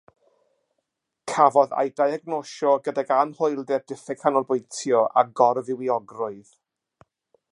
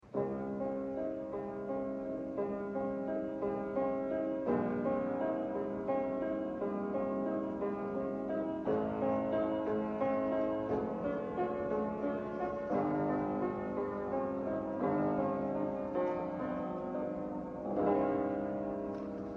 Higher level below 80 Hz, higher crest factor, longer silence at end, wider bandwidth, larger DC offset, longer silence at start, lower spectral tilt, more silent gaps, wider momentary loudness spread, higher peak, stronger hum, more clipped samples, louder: second, -80 dBFS vs -62 dBFS; first, 22 dB vs 16 dB; first, 1.1 s vs 0 s; first, 11.5 kHz vs 6.6 kHz; neither; first, 1.25 s vs 0.05 s; second, -5 dB/octave vs -9.5 dB/octave; neither; first, 12 LU vs 5 LU; first, -2 dBFS vs -18 dBFS; neither; neither; first, -23 LUFS vs -36 LUFS